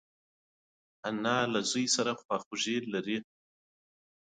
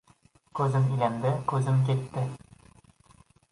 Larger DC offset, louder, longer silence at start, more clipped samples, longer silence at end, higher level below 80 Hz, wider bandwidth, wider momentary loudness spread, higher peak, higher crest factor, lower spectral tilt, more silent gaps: neither; second, -32 LUFS vs -27 LUFS; first, 1.05 s vs 0.55 s; neither; second, 1 s vs 1.15 s; second, -76 dBFS vs -62 dBFS; second, 9.6 kHz vs 11.5 kHz; about the same, 9 LU vs 10 LU; second, -16 dBFS vs -12 dBFS; about the same, 20 dB vs 18 dB; second, -3 dB/octave vs -8 dB/octave; first, 2.25-2.29 s, 2.46-2.51 s vs none